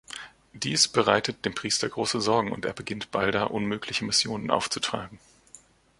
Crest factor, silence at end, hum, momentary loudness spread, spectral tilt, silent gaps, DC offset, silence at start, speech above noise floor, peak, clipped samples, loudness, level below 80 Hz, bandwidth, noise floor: 24 dB; 0.45 s; none; 12 LU; -3 dB/octave; none; under 0.1%; 0.1 s; 28 dB; -4 dBFS; under 0.1%; -26 LUFS; -58 dBFS; 11.5 kHz; -55 dBFS